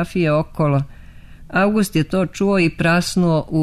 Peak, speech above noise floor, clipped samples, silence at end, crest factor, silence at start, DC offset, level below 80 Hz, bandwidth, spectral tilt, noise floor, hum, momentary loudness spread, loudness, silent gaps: -6 dBFS; 22 dB; under 0.1%; 0 s; 12 dB; 0 s; under 0.1%; -40 dBFS; 13.5 kHz; -6.5 dB/octave; -39 dBFS; none; 4 LU; -18 LUFS; none